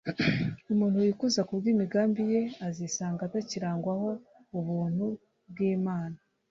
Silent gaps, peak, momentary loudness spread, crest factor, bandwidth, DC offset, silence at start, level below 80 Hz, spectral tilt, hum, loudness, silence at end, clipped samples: none; -14 dBFS; 10 LU; 16 dB; 7.8 kHz; under 0.1%; 0.05 s; -64 dBFS; -6 dB/octave; none; -30 LUFS; 0.35 s; under 0.1%